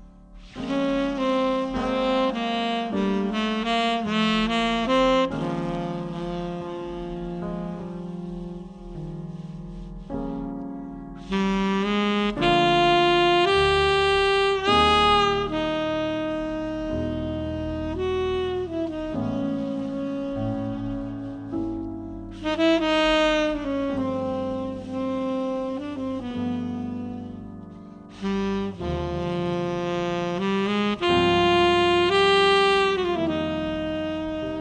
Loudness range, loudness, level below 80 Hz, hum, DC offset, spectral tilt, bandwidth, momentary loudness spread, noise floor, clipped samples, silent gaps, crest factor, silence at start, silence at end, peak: 11 LU; -24 LUFS; -44 dBFS; none; under 0.1%; -5.5 dB/octave; 9.8 kHz; 15 LU; -45 dBFS; under 0.1%; none; 18 dB; 0 s; 0 s; -6 dBFS